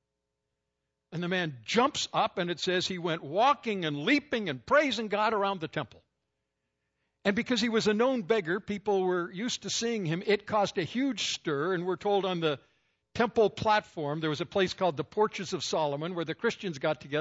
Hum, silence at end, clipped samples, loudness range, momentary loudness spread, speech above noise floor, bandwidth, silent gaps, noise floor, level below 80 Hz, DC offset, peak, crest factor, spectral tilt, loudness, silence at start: none; 0 s; under 0.1%; 3 LU; 7 LU; 55 dB; 8 kHz; none; -84 dBFS; -68 dBFS; under 0.1%; -12 dBFS; 18 dB; -4.5 dB/octave; -29 LUFS; 1.1 s